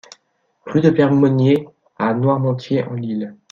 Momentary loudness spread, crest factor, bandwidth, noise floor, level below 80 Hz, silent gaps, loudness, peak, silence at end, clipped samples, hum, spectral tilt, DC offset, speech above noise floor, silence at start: 10 LU; 16 dB; 7.2 kHz; -64 dBFS; -60 dBFS; none; -17 LUFS; -2 dBFS; 0.2 s; under 0.1%; none; -8.5 dB/octave; under 0.1%; 48 dB; 0.65 s